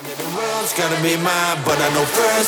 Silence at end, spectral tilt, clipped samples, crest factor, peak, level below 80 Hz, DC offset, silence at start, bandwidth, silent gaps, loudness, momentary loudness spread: 0 s; -3 dB/octave; under 0.1%; 16 dB; -2 dBFS; -56 dBFS; under 0.1%; 0 s; over 20 kHz; none; -18 LUFS; 6 LU